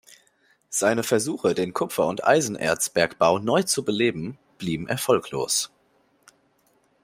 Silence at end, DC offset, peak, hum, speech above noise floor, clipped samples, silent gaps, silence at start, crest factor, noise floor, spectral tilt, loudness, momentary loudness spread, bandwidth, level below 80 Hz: 1.4 s; under 0.1%; -4 dBFS; none; 42 dB; under 0.1%; none; 0.7 s; 20 dB; -65 dBFS; -3.5 dB/octave; -23 LUFS; 9 LU; 16 kHz; -62 dBFS